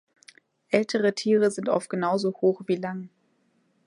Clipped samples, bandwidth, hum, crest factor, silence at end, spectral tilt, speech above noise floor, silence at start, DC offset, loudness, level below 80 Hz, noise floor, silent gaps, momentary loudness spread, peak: under 0.1%; 11 kHz; none; 20 dB; 0.8 s; -5.5 dB/octave; 44 dB; 0.7 s; under 0.1%; -25 LUFS; -76 dBFS; -68 dBFS; none; 9 LU; -8 dBFS